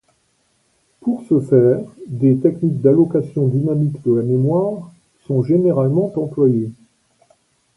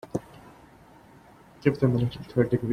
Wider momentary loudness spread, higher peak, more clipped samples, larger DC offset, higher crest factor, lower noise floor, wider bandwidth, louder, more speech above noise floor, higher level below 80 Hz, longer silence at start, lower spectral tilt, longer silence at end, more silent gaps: about the same, 10 LU vs 10 LU; first, -2 dBFS vs -8 dBFS; neither; neither; about the same, 16 dB vs 20 dB; first, -63 dBFS vs -53 dBFS; about the same, 11 kHz vs 10.5 kHz; first, -17 LUFS vs -27 LUFS; first, 47 dB vs 28 dB; about the same, -58 dBFS vs -54 dBFS; first, 1.05 s vs 0.05 s; first, -11.5 dB/octave vs -8.5 dB/octave; first, 1.05 s vs 0 s; neither